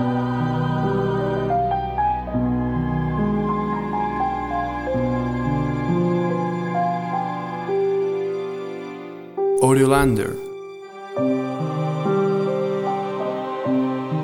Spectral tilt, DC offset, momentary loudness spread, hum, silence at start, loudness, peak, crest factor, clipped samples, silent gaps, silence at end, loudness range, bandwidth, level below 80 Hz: -7 dB/octave; under 0.1%; 8 LU; none; 0 s; -22 LUFS; -2 dBFS; 18 dB; under 0.1%; none; 0 s; 2 LU; 16.5 kHz; -40 dBFS